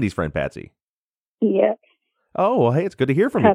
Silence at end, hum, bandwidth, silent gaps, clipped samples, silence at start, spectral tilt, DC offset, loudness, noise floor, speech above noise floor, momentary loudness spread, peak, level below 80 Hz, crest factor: 0 s; none; 11.5 kHz; 0.82-1.38 s; under 0.1%; 0 s; -8 dB/octave; under 0.1%; -20 LUFS; under -90 dBFS; over 71 dB; 13 LU; -2 dBFS; -48 dBFS; 18 dB